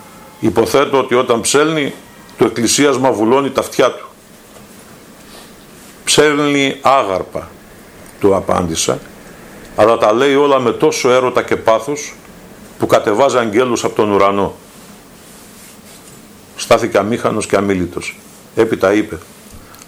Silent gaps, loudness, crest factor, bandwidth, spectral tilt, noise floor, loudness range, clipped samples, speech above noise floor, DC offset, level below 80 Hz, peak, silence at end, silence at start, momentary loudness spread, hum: none; -14 LUFS; 16 dB; 16 kHz; -4 dB/octave; -40 dBFS; 4 LU; under 0.1%; 27 dB; under 0.1%; -48 dBFS; 0 dBFS; 0.25 s; 0 s; 14 LU; none